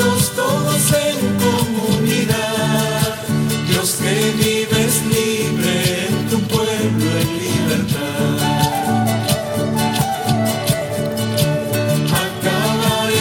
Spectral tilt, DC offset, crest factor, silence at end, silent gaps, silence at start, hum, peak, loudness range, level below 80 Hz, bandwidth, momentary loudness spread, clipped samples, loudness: -4.5 dB/octave; under 0.1%; 16 dB; 0 s; none; 0 s; none; -2 dBFS; 1 LU; -44 dBFS; 17.5 kHz; 3 LU; under 0.1%; -17 LUFS